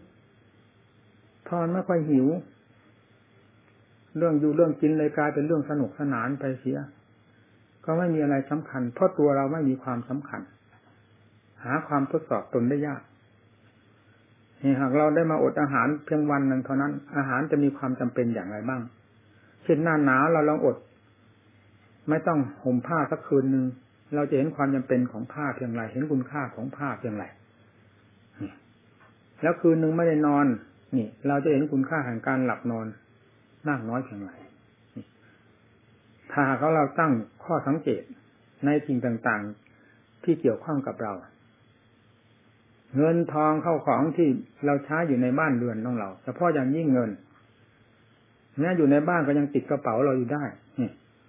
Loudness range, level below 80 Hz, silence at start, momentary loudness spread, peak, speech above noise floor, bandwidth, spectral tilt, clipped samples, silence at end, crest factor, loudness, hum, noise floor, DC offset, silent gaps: 6 LU; -72 dBFS; 1.45 s; 12 LU; -8 dBFS; 35 dB; 3.7 kHz; -12 dB/octave; under 0.1%; 0.35 s; 18 dB; -26 LUFS; none; -60 dBFS; under 0.1%; none